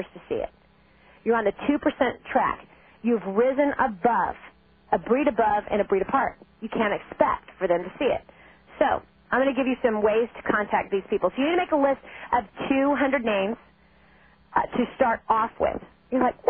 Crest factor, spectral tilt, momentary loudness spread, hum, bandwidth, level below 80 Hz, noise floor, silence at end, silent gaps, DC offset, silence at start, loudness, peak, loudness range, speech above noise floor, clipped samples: 20 dB; -9.5 dB/octave; 8 LU; none; 3.6 kHz; -54 dBFS; -58 dBFS; 0 s; none; under 0.1%; 0 s; -25 LUFS; -6 dBFS; 2 LU; 34 dB; under 0.1%